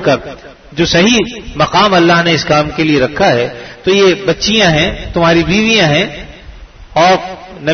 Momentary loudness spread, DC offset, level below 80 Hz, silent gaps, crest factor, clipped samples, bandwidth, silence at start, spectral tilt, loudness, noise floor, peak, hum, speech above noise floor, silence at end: 11 LU; under 0.1%; -34 dBFS; none; 12 dB; under 0.1%; 6.6 kHz; 0 s; -4.5 dB/octave; -11 LUFS; -33 dBFS; 0 dBFS; none; 22 dB; 0 s